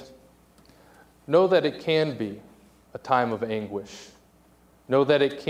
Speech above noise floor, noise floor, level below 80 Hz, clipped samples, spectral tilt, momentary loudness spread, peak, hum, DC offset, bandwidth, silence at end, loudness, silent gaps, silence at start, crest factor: 34 dB; -58 dBFS; -64 dBFS; under 0.1%; -6 dB/octave; 22 LU; -6 dBFS; none; under 0.1%; 14.5 kHz; 0 s; -24 LUFS; none; 0 s; 20 dB